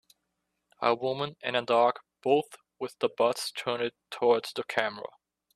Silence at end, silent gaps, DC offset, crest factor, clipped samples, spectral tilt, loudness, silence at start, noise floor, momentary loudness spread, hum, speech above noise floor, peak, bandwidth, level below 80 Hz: 0.5 s; none; under 0.1%; 22 dB; under 0.1%; -4 dB/octave; -29 LUFS; 0.8 s; -81 dBFS; 12 LU; none; 53 dB; -8 dBFS; 14 kHz; -76 dBFS